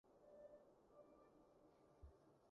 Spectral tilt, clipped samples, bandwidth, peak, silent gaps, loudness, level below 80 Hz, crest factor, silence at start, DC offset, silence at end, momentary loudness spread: -7.5 dB/octave; under 0.1%; 6 kHz; -52 dBFS; none; -68 LUFS; -76 dBFS; 16 dB; 0.05 s; under 0.1%; 0 s; 4 LU